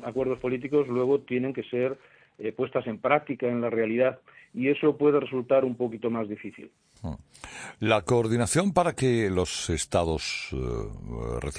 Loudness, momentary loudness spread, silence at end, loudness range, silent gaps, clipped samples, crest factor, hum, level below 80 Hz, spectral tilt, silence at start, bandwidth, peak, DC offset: -27 LUFS; 16 LU; 0 s; 3 LU; none; under 0.1%; 20 dB; none; -46 dBFS; -5.5 dB/octave; 0 s; 10.5 kHz; -8 dBFS; under 0.1%